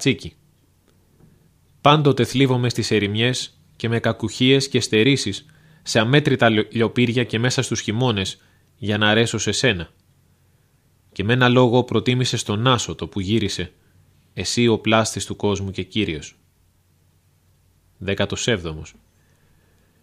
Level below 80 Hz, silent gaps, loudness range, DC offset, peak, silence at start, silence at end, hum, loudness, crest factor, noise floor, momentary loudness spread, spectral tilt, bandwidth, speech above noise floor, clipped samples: -52 dBFS; none; 8 LU; under 0.1%; 0 dBFS; 0 s; 1.15 s; none; -20 LUFS; 22 dB; -60 dBFS; 14 LU; -5 dB/octave; 15 kHz; 40 dB; under 0.1%